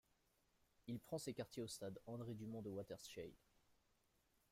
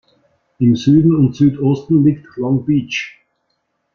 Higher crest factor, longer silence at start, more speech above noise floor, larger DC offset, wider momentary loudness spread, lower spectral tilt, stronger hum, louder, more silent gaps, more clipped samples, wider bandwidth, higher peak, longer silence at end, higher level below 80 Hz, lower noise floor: about the same, 18 dB vs 14 dB; first, 0.85 s vs 0.6 s; second, 31 dB vs 55 dB; neither; second, 6 LU vs 11 LU; second, -5.5 dB/octave vs -8 dB/octave; neither; second, -52 LUFS vs -15 LUFS; neither; neither; first, 16 kHz vs 6.8 kHz; second, -36 dBFS vs -2 dBFS; about the same, 0.8 s vs 0.85 s; second, -80 dBFS vs -48 dBFS; first, -82 dBFS vs -68 dBFS